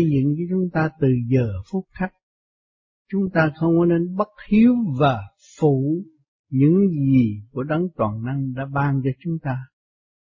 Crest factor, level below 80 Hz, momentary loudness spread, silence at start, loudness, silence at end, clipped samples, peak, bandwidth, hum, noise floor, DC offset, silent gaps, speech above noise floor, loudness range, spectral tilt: 16 dB; -50 dBFS; 12 LU; 0 s; -21 LUFS; 0.65 s; under 0.1%; -6 dBFS; 7.2 kHz; none; under -90 dBFS; under 0.1%; 2.23-3.05 s, 6.28-6.44 s; over 70 dB; 4 LU; -9.5 dB/octave